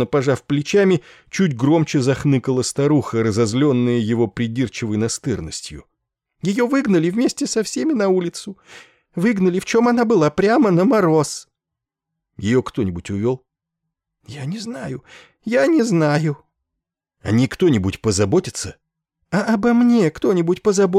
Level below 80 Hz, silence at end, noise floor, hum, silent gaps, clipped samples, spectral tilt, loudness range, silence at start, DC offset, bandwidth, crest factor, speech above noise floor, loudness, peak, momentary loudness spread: -52 dBFS; 0 s; -84 dBFS; none; none; under 0.1%; -6 dB/octave; 6 LU; 0 s; under 0.1%; 13.5 kHz; 12 dB; 66 dB; -18 LUFS; -6 dBFS; 13 LU